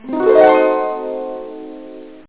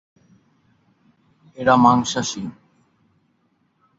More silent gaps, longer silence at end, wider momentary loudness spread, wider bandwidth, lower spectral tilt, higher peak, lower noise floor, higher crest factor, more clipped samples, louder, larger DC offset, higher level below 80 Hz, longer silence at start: neither; second, 0.15 s vs 1.5 s; first, 23 LU vs 17 LU; second, 4 kHz vs 7.8 kHz; first, -8.5 dB/octave vs -4.5 dB/octave; about the same, 0 dBFS vs -2 dBFS; second, -35 dBFS vs -65 dBFS; second, 16 dB vs 22 dB; neither; first, -14 LUFS vs -18 LUFS; first, 0.6% vs under 0.1%; about the same, -56 dBFS vs -58 dBFS; second, 0.05 s vs 1.6 s